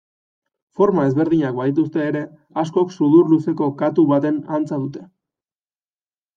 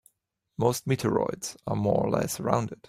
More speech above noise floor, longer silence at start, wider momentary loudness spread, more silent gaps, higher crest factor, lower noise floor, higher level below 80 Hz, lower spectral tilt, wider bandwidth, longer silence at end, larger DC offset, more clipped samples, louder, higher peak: first, over 72 dB vs 49 dB; first, 0.8 s vs 0.6 s; first, 12 LU vs 6 LU; neither; second, 16 dB vs 22 dB; first, under -90 dBFS vs -76 dBFS; second, -64 dBFS vs -58 dBFS; first, -9 dB/octave vs -6 dB/octave; second, 7 kHz vs 16 kHz; first, 1.3 s vs 0.15 s; neither; neither; first, -18 LUFS vs -28 LUFS; first, -2 dBFS vs -6 dBFS